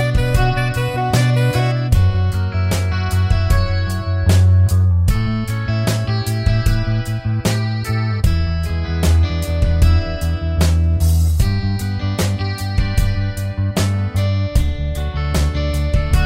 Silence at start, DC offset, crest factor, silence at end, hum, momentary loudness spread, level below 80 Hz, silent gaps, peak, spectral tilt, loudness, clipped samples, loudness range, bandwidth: 0 s; under 0.1%; 14 dB; 0 s; none; 6 LU; -22 dBFS; none; -2 dBFS; -6 dB/octave; -18 LUFS; under 0.1%; 3 LU; 16 kHz